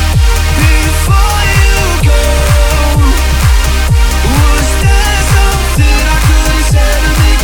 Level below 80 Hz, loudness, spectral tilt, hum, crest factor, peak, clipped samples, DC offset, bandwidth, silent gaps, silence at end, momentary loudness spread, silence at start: -10 dBFS; -10 LUFS; -4 dB/octave; none; 8 dB; 0 dBFS; under 0.1%; under 0.1%; 19.5 kHz; none; 0 s; 1 LU; 0 s